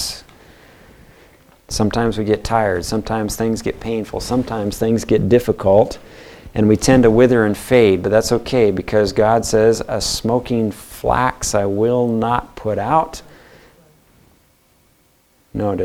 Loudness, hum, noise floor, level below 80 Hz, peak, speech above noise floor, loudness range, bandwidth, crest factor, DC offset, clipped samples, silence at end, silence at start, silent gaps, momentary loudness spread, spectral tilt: -17 LUFS; none; -57 dBFS; -38 dBFS; 0 dBFS; 41 dB; 7 LU; 16.5 kHz; 18 dB; under 0.1%; under 0.1%; 0 s; 0 s; none; 11 LU; -5.5 dB/octave